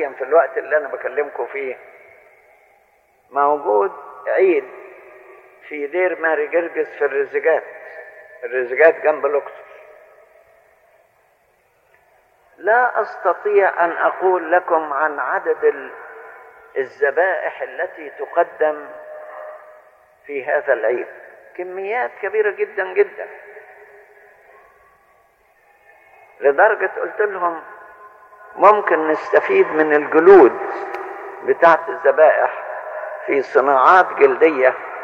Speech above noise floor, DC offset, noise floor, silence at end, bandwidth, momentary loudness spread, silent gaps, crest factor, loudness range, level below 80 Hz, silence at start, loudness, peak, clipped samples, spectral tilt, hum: 42 dB; under 0.1%; -59 dBFS; 0 s; 6.6 kHz; 20 LU; none; 18 dB; 10 LU; -68 dBFS; 0 s; -17 LUFS; -2 dBFS; under 0.1%; -6 dB/octave; none